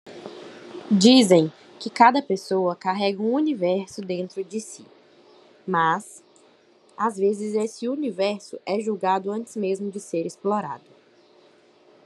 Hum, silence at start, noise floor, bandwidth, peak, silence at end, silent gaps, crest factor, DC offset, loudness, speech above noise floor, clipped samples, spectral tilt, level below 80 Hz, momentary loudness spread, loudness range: none; 0.05 s; -57 dBFS; 12 kHz; -2 dBFS; 1.3 s; none; 22 dB; under 0.1%; -23 LUFS; 34 dB; under 0.1%; -5 dB/octave; -82 dBFS; 22 LU; 8 LU